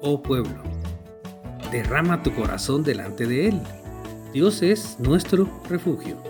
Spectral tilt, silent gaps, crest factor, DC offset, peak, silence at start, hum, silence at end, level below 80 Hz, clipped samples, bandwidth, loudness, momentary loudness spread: -6 dB/octave; none; 18 dB; under 0.1%; -4 dBFS; 0 s; none; 0 s; -38 dBFS; under 0.1%; 19.5 kHz; -23 LUFS; 17 LU